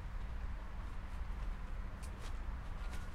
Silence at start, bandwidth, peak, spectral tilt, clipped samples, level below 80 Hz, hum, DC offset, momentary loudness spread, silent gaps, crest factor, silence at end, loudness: 0 s; 12.5 kHz; -32 dBFS; -6 dB/octave; under 0.1%; -44 dBFS; none; under 0.1%; 2 LU; none; 10 dB; 0 s; -48 LUFS